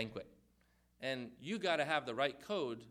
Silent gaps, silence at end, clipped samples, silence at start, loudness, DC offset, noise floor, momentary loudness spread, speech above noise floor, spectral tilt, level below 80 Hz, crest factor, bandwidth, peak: none; 0 s; under 0.1%; 0 s; -39 LUFS; under 0.1%; -73 dBFS; 9 LU; 34 dB; -4.5 dB/octave; -76 dBFS; 22 dB; 15.5 kHz; -18 dBFS